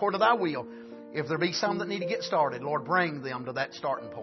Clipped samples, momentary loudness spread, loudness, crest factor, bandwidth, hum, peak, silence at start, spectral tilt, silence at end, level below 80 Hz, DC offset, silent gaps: under 0.1%; 11 LU; -29 LUFS; 20 dB; 6.2 kHz; none; -8 dBFS; 0 s; -5 dB/octave; 0 s; -74 dBFS; under 0.1%; none